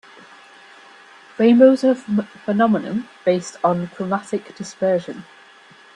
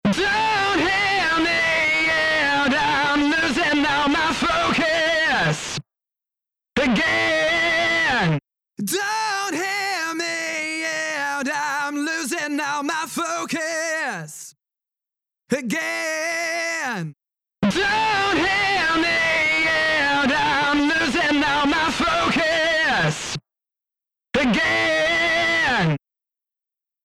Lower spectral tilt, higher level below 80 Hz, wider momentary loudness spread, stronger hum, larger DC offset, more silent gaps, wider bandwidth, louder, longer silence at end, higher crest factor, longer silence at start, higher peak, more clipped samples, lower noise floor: first, -6.5 dB/octave vs -3.5 dB/octave; second, -66 dBFS vs -48 dBFS; first, 16 LU vs 7 LU; neither; neither; neither; second, 10.5 kHz vs 15.5 kHz; about the same, -19 LUFS vs -20 LUFS; second, 0.75 s vs 1.1 s; first, 20 dB vs 14 dB; first, 1.4 s vs 0.05 s; first, 0 dBFS vs -8 dBFS; neither; second, -47 dBFS vs -89 dBFS